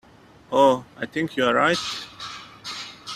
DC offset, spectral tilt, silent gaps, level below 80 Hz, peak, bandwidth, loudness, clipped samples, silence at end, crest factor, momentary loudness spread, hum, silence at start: under 0.1%; -4 dB/octave; none; -62 dBFS; -4 dBFS; 14 kHz; -22 LUFS; under 0.1%; 0 s; 20 dB; 17 LU; none; 0.5 s